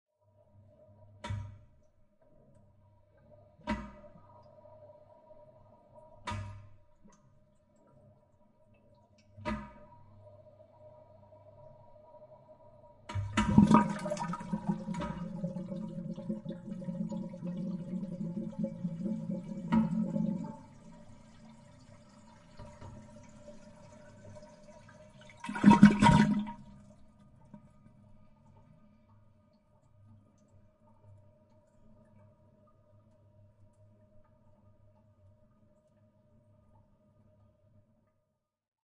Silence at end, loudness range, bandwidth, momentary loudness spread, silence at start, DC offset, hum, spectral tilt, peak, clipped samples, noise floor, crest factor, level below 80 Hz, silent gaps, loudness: 11.45 s; 23 LU; 11 kHz; 31 LU; 1.25 s; under 0.1%; none; -7 dB/octave; -6 dBFS; under 0.1%; -81 dBFS; 30 dB; -56 dBFS; none; -31 LUFS